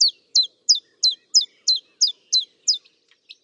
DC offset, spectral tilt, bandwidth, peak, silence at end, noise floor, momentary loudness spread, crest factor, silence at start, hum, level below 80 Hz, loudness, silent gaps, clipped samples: under 0.1%; 6.5 dB/octave; 11.5 kHz; -6 dBFS; 0.65 s; -60 dBFS; 5 LU; 16 dB; 0 s; none; under -90 dBFS; -19 LUFS; none; under 0.1%